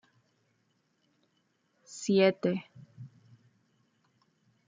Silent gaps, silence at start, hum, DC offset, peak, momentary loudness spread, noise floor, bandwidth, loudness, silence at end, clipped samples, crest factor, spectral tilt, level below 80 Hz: none; 1.9 s; none; under 0.1%; -12 dBFS; 26 LU; -75 dBFS; 9.4 kHz; -29 LUFS; 1.6 s; under 0.1%; 24 dB; -5.5 dB/octave; -82 dBFS